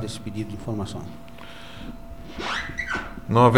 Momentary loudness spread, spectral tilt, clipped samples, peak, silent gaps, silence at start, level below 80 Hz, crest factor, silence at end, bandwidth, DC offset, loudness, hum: 15 LU; -6 dB/octave; under 0.1%; -2 dBFS; none; 0 s; -44 dBFS; 22 dB; 0 s; 16 kHz; 0.9%; -28 LUFS; none